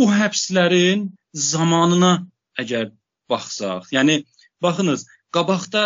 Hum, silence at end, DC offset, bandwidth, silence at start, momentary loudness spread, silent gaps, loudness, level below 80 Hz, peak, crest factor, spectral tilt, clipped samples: none; 0 s; under 0.1%; 7.8 kHz; 0 s; 11 LU; none; -19 LUFS; -66 dBFS; -4 dBFS; 16 dB; -4 dB/octave; under 0.1%